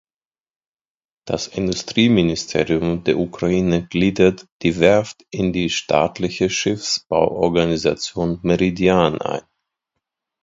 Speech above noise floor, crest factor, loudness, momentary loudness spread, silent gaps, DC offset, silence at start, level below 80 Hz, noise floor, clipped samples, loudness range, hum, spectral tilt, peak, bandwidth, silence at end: over 72 dB; 20 dB; -19 LUFS; 7 LU; 4.52-4.60 s; under 0.1%; 1.25 s; -44 dBFS; under -90 dBFS; under 0.1%; 2 LU; none; -5 dB/octave; 0 dBFS; 7.8 kHz; 1.05 s